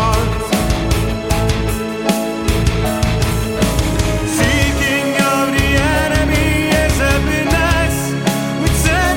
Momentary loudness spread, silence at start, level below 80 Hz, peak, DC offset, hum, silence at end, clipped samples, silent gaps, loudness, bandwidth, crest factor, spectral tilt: 4 LU; 0 s; -22 dBFS; 0 dBFS; under 0.1%; none; 0 s; under 0.1%; none; -15 LUFS; 17 kHz; 14 dB; -5 dB/octave